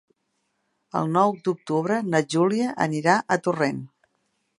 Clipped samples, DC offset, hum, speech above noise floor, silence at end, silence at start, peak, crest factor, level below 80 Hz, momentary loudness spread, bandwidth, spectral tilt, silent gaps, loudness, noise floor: under 0.1%; under 0.1%; none; 52 dB; 0.7 s; 0.95 s; -4 dBFS; 22 dB; -70 dBFS; 7 LU; 11.5 kHz; -6 dB/octave; none; -23 LUFS; -74 dBFS